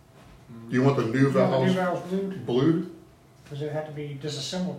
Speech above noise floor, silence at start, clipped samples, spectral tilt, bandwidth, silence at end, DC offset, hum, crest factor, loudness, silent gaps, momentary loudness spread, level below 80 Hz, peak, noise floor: 27 dB; 0.3 s; under 0.1%; -7 dB/octave; 13.5 kHz; 0 s; under 0.1%; none; 18 dB; -26 LUFS; none; 14 LU; -62 dBFS; -8 dBFS; -52 dBFS